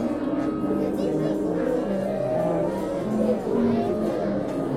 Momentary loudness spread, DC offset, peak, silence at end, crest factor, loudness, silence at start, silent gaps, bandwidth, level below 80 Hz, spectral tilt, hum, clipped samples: 3 LU; under 0.1%; -12 dBFS; 0 s; 12 dB; -25 LUFS; 0 s; none; 14.5 kHz; -50 dBFS; -8 dB/octave; none; under 0.1%